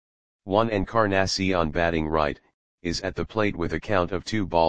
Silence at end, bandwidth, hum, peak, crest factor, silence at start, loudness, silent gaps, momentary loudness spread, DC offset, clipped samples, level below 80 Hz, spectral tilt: 0 s; 9.8 kHz; none; -4 dBFS; 20 dB; 0.4 s; -25 LUFS; 2.54-2.78 s; 7 LU; 0.9%; under 0.1%; -42 dBFS; -5.5 dB/octave